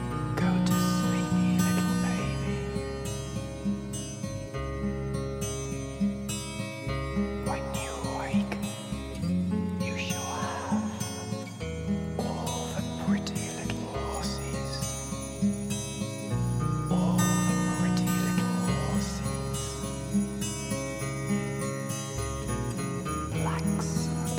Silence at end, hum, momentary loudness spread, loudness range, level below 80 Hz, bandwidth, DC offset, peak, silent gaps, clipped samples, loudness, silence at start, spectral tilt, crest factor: 0 s; none; 8 LU; 5 LU; -44 dBFS; 16.5 kHz; under 0.1%; -12 dBFS; none; under 0.1%; -30 LUFS; 0 s; -5.5 dB/octave; 18 dB